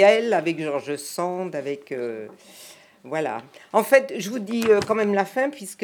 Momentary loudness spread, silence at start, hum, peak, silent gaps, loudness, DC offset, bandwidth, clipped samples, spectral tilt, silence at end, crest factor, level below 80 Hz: 16 LU; 0 s; none; -4 dBFS; none; -23 LUFS; under 0.1%; over 20 kHz; under 0.1%; -4.5 dB/octave; 0 s; 20 dB; -72 dBFS